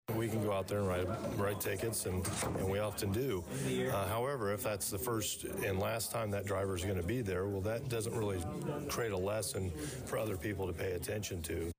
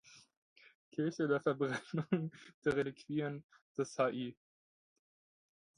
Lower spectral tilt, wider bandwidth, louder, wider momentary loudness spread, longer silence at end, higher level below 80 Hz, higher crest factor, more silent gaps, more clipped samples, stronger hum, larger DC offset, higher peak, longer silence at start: second, -5 dB/octave vs -6.5 dB/octave; first, 16 kHz vs 10.5 kHz; about the same, -37 LUFS vs -38 LUFS; second, 4 LU vs 12 LU; second, 0.05 s vs 1.45 s; first, -56 dBFS vs -74 dBFS; second, 12 dB vs 20 dB; second, none vs 0.37-0.56 s, 0.75-0.91 s, 2.54-2.62 s, 3.44-3.49 s, 3.62-3.75 s; neither; neither; neither; second, -24 dBFS vs -18 dBFS; about the same, 0.1 s vs 0.1 s